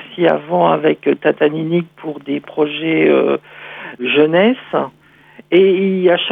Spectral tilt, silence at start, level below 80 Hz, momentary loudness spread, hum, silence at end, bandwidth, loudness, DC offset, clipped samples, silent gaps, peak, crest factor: -9 dB/octave; 0 s; -68 dBFS; 13 LU; none; 0 s; 4.5 kHz; -15 LUFS; under 0.1%; under 0.1%; none; -2 dBFS; 14 dB